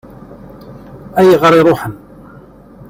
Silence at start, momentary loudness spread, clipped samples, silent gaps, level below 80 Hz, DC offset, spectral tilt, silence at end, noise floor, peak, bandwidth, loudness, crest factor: 0.3 s; 13 LU; under 0.1%; none; -46 dBFS; under 0.1%; -6.5 dB/octave; 0.95 s; -38 dBFS; 0 dBFS; 16.5 kHz; -10 LUFS; 14 dB